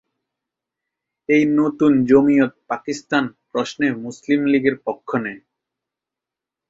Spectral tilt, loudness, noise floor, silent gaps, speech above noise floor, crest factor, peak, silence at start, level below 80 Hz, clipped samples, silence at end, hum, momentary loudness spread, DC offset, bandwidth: -6 dB/octave; -19 LUFS; -87 dBFS; none; 69 dB; 18 dB; -2 dBFS; 1.3 s; -58 dBFS; under 0.1%; 1.3 s; none; 13 LU; under 0.1%; 7.8 kHz